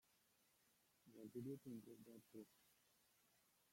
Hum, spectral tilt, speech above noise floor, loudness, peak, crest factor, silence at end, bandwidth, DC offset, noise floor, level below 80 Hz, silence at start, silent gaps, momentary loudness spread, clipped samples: none; -7 dB/octave; 24 dB; -59 LUFS; -42 dBFS; 20 dB; 0.1 s; 16.5 kHz; under 0.1%; -81 dBFS; under -90 dBFS; 0.1 s; none; 12 LU; under 0.1%